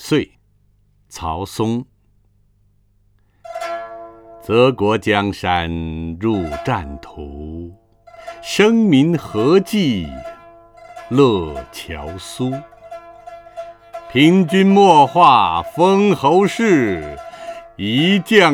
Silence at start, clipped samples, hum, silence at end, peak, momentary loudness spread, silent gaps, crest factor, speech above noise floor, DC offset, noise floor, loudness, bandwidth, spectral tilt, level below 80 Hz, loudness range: 0 s; under 0.1%; 50 Hz at -45 dBFS; 0 s; 0 dBFS; 23 LU; none; 18 dB; 42 dB; under 0.1%; -57 dBFS; -15 LUFS; 16.5 kHz; -6 dB/octave; -42 dBFS; 12 LU